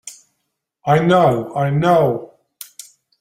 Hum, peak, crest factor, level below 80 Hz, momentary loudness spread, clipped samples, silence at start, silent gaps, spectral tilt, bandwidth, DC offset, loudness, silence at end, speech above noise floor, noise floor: none; -2 dBFS; 16 dB; -54 dBFS; 22 LU; under 0.1%; 0.05 s; none; -6.5 dB/octave; 16 kHz; under 0.1%; -16 LUFS; 0.95 s; 60 dB; -74 dBFS